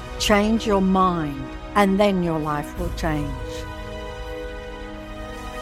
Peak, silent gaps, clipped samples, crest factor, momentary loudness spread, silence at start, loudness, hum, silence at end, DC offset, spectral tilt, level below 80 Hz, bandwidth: -2 dBFS; none; under 0.1%; 20 dB; 16 LU; 0 s; -22 LUFS; none; 0 s; under 0.1%; -5.5 dB/octave; -36 dBFS; 15.5 kHz